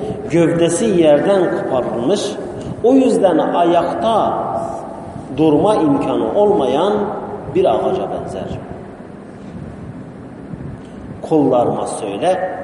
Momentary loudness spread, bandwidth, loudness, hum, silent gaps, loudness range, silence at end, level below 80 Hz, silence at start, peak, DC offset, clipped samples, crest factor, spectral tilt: 19 LU; 11.5 kHz; -16 LUFS; none; none; 8 LU; 0 s; -46 dBFS; 0 s; 0 dBFS; under 0.1%; under 0.1%; 16 dB; -6 dB/octave